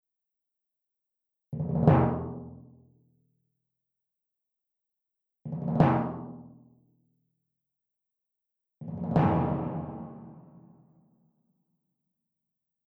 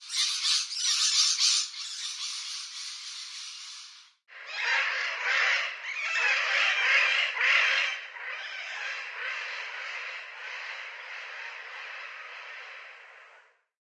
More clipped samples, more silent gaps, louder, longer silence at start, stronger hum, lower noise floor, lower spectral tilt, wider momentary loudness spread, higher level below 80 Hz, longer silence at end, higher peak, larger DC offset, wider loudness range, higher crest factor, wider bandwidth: neither; neither; about the same, -28 LUFS vs -27 LUFS; first, 1.5 s vs 0 s; neither; first, -87 dBFS vs -59 dBFS; first, -11 dB/octave vs 9.5 dB/octave; first, 23 LU vs 18 LU; first, -54 dBFS vs under -90 dBFS; first, 2.45 s vs 0.4 s; about the same, -8 dBFS vs -10 dBFS; neither; second, 11 LU vs 14 LU; about the same, 24 dB vs 20 dB; second, 5.2 kHz vs 11.5 kHz